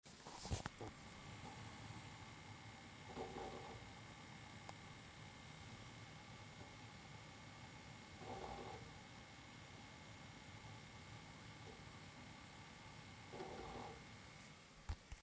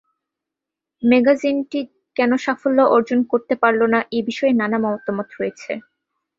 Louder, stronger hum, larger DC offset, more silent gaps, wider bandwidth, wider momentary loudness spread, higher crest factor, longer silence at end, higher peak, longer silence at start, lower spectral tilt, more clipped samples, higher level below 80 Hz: second, -55 LUFS vs -19 LUFS; neither; neither; neither; about the same, 8 kHz vs 7.6 kHz; second, 6 LU vs 12 LU; first, 28 dB vs 18 dB; second, 0 s vs 0.6 s; second, -28 dBFS vs -2 dBFS; second, 0.05 s vs 1 s; second, -4.5 dB/octave vs -6 dB/octave; neither; about the same, -64 dBFS vs -64 dBFS